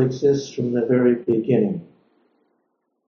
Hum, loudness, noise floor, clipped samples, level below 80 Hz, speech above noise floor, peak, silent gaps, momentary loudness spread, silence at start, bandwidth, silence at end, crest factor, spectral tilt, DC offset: none; -20 LUFS; -72 dBFS; under 0.1%; -64 dBFS; 53 dB; -6 dBFS; none; 6 LU; 0 s; 7 kHz; 1.25 s; 16 dB; -8 dB/octave; under 0.1%